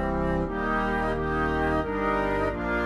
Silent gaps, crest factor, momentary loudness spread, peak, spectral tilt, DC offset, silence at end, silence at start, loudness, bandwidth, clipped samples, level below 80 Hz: none; 12 dB; 2 LU; -14 dBFS; -7.5 dB/octave; 0.1%; 0 s; 0 s; -26 LUFS; 12.5 kHz; under 0.1%; -36 dBFS